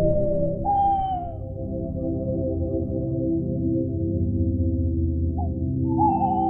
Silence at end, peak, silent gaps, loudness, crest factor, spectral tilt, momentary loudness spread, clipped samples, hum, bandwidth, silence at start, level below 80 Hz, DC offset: 0 s; -8 dBFS; none; -25 LUFS; 14 dB; -13.5 dB/octave; 7 LU; under 0.1%; none; 3.4 kHz; 0 s; -34 dBFS; under 0.1%